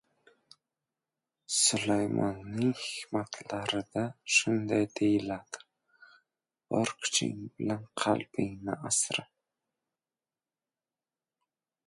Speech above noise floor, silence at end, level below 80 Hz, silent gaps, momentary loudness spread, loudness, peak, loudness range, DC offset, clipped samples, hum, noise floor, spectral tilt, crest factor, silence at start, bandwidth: over 59 dB; 2.65 s; -68 dBFS; none; 11 LU; -30 LUFS; -12 dBFS; 4 LU; under 0.1%; under 0.1%; none; under -90 dBFS; -3 dB/octave; 22 dB; 1.5 s; 11.5 kHz